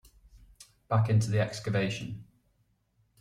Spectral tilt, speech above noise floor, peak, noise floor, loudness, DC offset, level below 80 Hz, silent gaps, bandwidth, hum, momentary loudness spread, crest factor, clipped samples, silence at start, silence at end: -6.5 dB/octave; 44 dB; -14 dBFS; -72 dBFS; -29 LUFS; under 0.1%; -60 dBFS; none; 11.5 kHz; none; 14 LU; 18 dB; under 0.1%; 0.35 s; 1 s